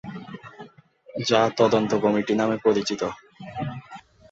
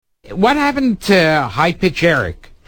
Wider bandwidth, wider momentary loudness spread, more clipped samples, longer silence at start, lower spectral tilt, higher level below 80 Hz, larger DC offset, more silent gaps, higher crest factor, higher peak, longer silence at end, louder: second, 8 kHz vs 19 kHz; first, 21 LU vs 6 LU; neither; second, 0.05 s vs 0.25 s; about the same, -5 dB/octave vs -5.5 dB/octave; second, -60 dBFS vs -40 dBFS; neither; neither; first, 20 dB vs 14 dB; second, -4 dBFS vs 0 dBFS; about the same, 0.3 s vs 0.35 s; second, -23 LUFS vs -14 LUFS